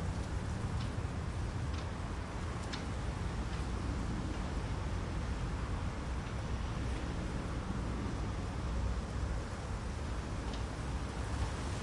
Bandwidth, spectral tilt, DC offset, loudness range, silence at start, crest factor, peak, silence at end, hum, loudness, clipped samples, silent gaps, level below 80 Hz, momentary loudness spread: 11.5 kHz; -6 dB/octave; under 0.1%; 1 LU; 0 s; 12 dB; -24 dBFS; 0 s; none; -39 LUFS; under 0.1%; none; -42 dBFS; 2 LU